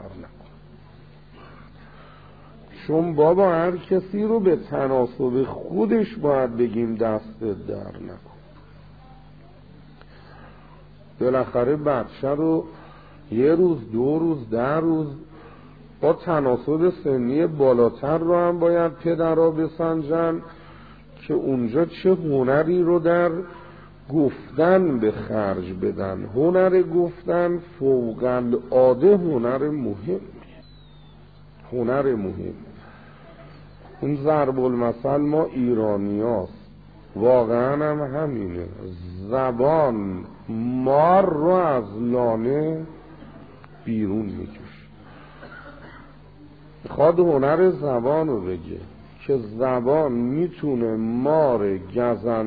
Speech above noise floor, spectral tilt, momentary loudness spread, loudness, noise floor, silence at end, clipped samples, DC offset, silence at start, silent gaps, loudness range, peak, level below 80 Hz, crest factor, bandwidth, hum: 27 dB; -11.5 dB/octave; 15 LU; -22 LUFS; -47 dBFS; 0 s; under 0.1%; 0.2%; 0 s; none; 8 LU; -4 dBFS; -52 dBFS; 18 dB; 4.9 kHz; 50 Hz at -50 dBFS